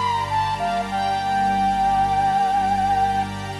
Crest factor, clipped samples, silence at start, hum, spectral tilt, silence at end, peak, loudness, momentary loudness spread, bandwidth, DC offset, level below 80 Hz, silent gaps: 10 dB; under 0.1%; 0 s; 50 Hz at -45 dBFS; -5 dB/octave; 0 s; -12 dBFS; -21 LUFS; 4 LU; 13 kHz; under 0.1%; -42 dBFS; none